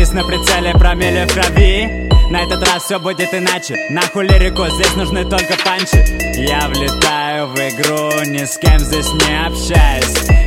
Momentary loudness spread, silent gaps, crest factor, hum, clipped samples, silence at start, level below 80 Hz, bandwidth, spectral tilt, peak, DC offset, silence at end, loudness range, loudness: 5 LU; none; 12 dB; none; under 0.1%; 0 s; -16 dBFS; 16.5 kHz; -4 dB/octave; 0 dBFS; under 0.1%; 0 s; 1 LU; -13 LUFS